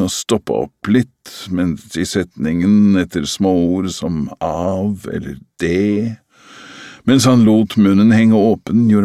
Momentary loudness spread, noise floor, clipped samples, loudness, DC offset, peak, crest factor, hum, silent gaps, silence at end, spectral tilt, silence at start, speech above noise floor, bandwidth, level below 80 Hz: 14 LU; -41 dBFS; under 0.1%; -15 LUFS; under 0.1%; 0 dBFS; 14 dB; none; none; 0 s; -6 dB/octave; 0 s; 26 dB; 14 kHz; -44 dBFS